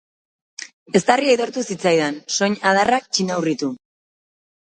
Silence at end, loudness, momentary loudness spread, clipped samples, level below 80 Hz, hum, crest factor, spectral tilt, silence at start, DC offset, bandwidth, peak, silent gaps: 0.95 s; -19 LUFS; 19 LU; under 0.1%; -64 dBFS; none; 20 dB; -3.5 dB/octave; 0.6 s; under 0.1%; 9.4 kHz; 0 dBFS; 0.73-0.86 s